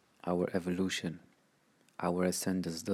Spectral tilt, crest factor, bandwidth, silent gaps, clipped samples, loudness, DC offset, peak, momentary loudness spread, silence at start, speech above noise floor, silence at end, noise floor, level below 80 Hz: -5 dB/octave; 18 dB; 15.5 kHz; none; under 0.1%; -35 LUFS; under 0.1%; -18 dBFS; 10 LU; 0.25 s; 36 dB; 0 s; -70 dBFS; -70 dBFS